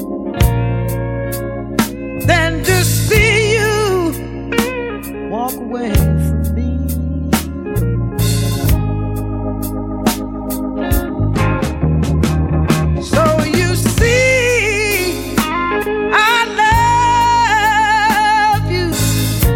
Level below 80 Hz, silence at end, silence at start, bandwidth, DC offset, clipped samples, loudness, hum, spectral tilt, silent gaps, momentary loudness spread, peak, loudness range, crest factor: -24 dBFS; 0 s; 0 s; 18 kHz; under 0.1%; under 0.1%; -15 LUFS; none; -5 dB/octave; none; 10 LU; 0 dBFS; 6 LU; 14 dB